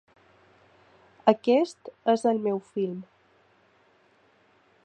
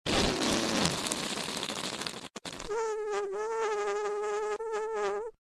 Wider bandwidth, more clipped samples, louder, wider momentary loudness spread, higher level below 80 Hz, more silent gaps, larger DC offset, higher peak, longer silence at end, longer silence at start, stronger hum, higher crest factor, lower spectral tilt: second, 9.2 kHz vs 13.5 kHz; neither; first, -26 LUFS vs -32 LUFS; about the same, 9 LU vs 9 LU; second, -80 dBFS vs -52 dBFS; neither; neither; first, -4 dBFS vs -8 dBFS; first, 1.8 s vs 0.25 s; first, 1.25 s vs 0.05 s; neither; about the same, 26 dB vs 26 dB; first, -6 dB/octave vs -3 dB/octave